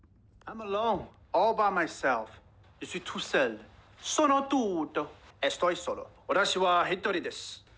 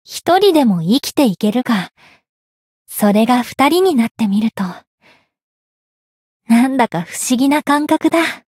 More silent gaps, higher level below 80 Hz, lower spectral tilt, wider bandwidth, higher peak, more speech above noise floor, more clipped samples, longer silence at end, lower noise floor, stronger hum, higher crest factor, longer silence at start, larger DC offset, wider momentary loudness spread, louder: second, none vs 2.29-2.85 s, 4.11-4.15 s, 4.87-4.98 s, 5.43-6.40 s; about the same, -62 dBFS vs -62 dBFS; second, -3 dB/octave vs -5 dB/octave; second, 8 kHz vs 16.5 kHz; second, -14 dBFS vs -2 dBFS; second, 21 dB vs over 76 dB; neither; about the same, 0.2 s vs 0.15 s; second, -51 dBFS vs under -90 dBFS; neither; about the same, 16 dB vs 14 dB; first, 0.45 s vs 0.1 s; neither; first, 15 LU vs 8 LU; second, -29 LUFS vs -15 LUFS